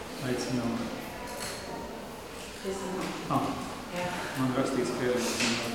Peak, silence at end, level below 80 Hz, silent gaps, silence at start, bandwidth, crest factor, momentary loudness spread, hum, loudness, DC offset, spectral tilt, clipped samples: -14 dBFS; 0 s; -56 dBFS; none; 0 s; 19 kHz; 18 dB; 11 LU; none; -32 LUFS; 0.1%; -4 dB/octave; under 0.1%